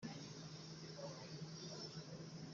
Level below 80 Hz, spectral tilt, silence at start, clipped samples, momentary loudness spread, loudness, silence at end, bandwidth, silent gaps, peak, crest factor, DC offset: -80 dBFS; -5 dB/octave; 0 s; under 0.1%; 3 LU; -52 LUFS; 0 s; 7.4 kHz; none; -38 dBFS; 14 dB; under 0.1%